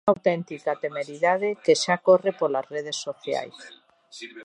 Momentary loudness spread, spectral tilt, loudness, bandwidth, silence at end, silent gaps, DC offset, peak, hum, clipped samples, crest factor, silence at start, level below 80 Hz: 14 LU; -4 dB/octave; -24 LUFS; 11 kHz; 0 s; none; under 0.1%; -6 dBFS; none; under 0.1%; 20 dB; 0.05 s; -76 dBFS